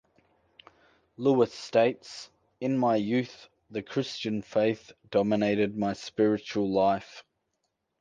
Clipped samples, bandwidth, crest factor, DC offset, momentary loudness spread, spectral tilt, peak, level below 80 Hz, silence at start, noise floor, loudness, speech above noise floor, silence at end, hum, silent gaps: under 0.1%; 9.4 kHz; 18 dB; under 0.1%; 14 LU; -6.5 dB/octave; -10 dBFS; -66 dBFS; 1.2 s; -80 dBFS; -28 LUFS; 52 dB; 0.8 s; none; none